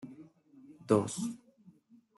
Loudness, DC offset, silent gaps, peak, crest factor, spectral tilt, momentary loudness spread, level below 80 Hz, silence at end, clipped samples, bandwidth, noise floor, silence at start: -32 LUFS; under 0.1%; none; -12 dBFS; 24 dB; -6 dB/octave; 24 LU; -78 dBFS; 0.5 s; under 0.1%; 12 kHz; -62 dBFS; 0 s